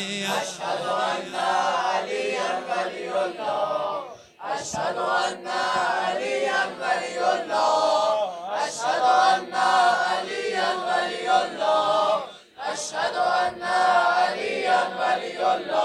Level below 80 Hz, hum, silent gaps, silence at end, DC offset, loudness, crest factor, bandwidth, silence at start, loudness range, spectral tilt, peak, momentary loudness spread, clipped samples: -70 dBFS; none; none; 0 s; under 0.1%; -24 LUFS; 16 dB; 13 kHz; 0 s; 5 LU; -2 dB/octave; -8 dBFS; 8 LU; under 0.1%